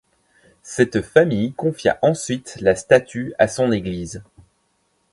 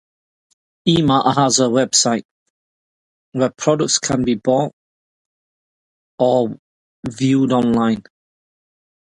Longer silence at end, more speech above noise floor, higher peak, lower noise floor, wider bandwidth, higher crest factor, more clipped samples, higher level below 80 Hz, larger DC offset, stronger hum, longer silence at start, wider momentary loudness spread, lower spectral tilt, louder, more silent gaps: second, 0.9 s vs 1.2 s; second, 47 dB vs over 74 dB; about the same, 0 dBFS vs 0 dBFS; second, -66 dBFS vs under -90 dBFS; about the same, 11.5 kHz vs 11.5 kHz; about the same, 20 dB vs 18 dB; neither; about the same, -50 dBFS vs -52 dBFS; neither; neither; second, 0.65 s vs 0.85 s; about the same, 13 LU vs 11 LU; about the same, -5.5 dB/octave vs -4.5 dB/octave; about the same, -19 LUFS vs -17 LUFS; second, none vs 2.25-3.32 s, 4.73-6.18 s, 6.59-7.03 s